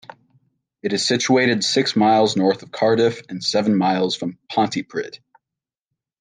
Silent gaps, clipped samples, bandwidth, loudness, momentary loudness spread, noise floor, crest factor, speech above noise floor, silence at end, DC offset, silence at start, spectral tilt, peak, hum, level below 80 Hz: none; under 0.1%; 10 kHz; -19 LUFS; 10 LU; -87 dBFS; 16 dB; 68 dB; 1.05 s; under 0.1%; 0.85 s; -4.5 dB/octave; -4 dBFS; none; -68 dBFS